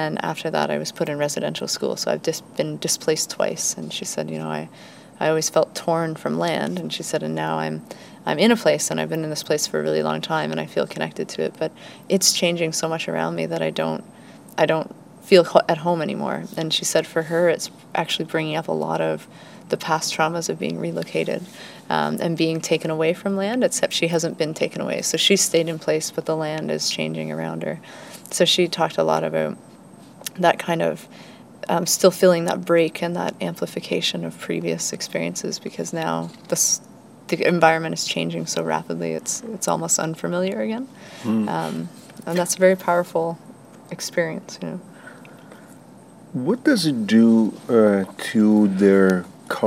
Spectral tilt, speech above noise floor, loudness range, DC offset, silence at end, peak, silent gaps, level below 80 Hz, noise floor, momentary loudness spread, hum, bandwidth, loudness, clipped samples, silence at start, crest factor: -4 dB/octave; 23 dB; 4 LU; under 0.1%; 0 s; 0 dBFS; none; -72 dBFS; -45 dBFS; 13 LU; none; 16 kHz; -22 LUFS; under 0.1%; 0 s; 22 dB